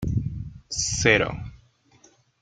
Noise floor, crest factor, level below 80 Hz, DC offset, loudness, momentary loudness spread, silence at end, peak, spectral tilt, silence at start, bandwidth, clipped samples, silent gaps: -58 dBFS; 24 dB; -42 dBFS; under 0.1%; -23 LUFS; 19 LU; 0.85 s; -2 dBFS; -3.5 dB/octave; 0 s; 10 kHz; under 0.1%; none